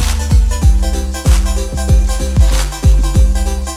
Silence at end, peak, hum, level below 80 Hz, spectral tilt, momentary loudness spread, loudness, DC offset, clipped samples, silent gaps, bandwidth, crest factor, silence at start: 0 s; 0 dBFS; none; -12 dBFS; -5 dB/octave; 5 LU; -14 LUFS; under 0.1%; under 0.1%; none; 15 kHz; 10 dB; 0 s